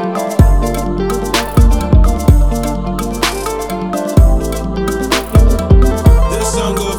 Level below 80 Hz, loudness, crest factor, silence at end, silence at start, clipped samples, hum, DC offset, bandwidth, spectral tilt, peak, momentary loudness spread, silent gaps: -14 dBFS; -13 LUFS; 12 dB; 0 s; 0 s; 0.4%; none; 0.9%; 18.5 kHz; -6 dB/octave; 0 dBFS; 8 LU; none